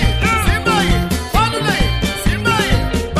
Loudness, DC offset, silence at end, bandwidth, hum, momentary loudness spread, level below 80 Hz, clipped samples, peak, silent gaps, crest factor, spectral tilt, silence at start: -16 LUFS; under 0.1%; 0 s; 15.5 kHz; none; 3 LU; -20 dBFS; under 0.1%; -2 dBFS; none; 14 dB; -4.5 dB/octave; 0 s